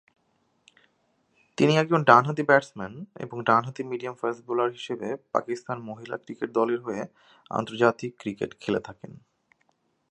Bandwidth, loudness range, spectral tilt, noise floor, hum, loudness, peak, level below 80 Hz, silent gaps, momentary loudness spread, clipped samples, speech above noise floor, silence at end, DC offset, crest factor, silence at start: 10.5 kHz; 7 LU; -6 dB/octave; -70 dBFS; none; -26 LUFS; -2 dBFS; -70 dBFS; none; 17 LU; under 0.1%; 45 dB; 0.95 s; under 0.1%; 26 dB; 1.6 s